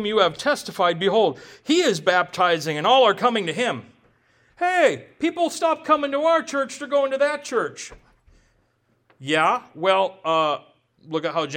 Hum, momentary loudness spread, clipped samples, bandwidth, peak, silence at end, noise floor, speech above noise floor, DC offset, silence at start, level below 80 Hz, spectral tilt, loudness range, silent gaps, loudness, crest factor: none; 8 LU; under 0.1%; 17 kHz; -4 dBFS; 0 s; -66 dBFS; 45 dB; under 0.1%; 0 s; -64 dBFS; -3.5 dB/octave; 5 LU; none; -21 LUFS; 18 dB